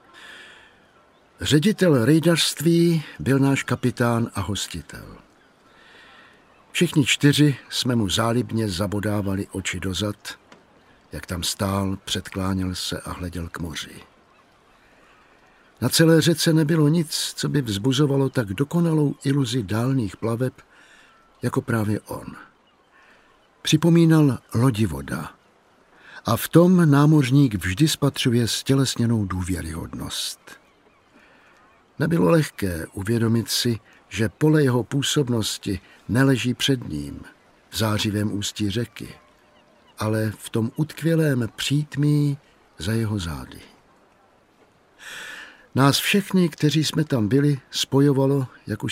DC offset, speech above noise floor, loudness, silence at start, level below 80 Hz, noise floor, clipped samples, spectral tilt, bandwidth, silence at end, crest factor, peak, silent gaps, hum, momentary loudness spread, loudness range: under 0.1%; 37 dB; -22 LUFS; 0.15 s; -50 dBFS; -58 dBFS; under 0.1%; -5.5 dB/octave; 16 kHz; 0 s; 22 dB; -2 dBFS; none; none; 15 LU; 8 LU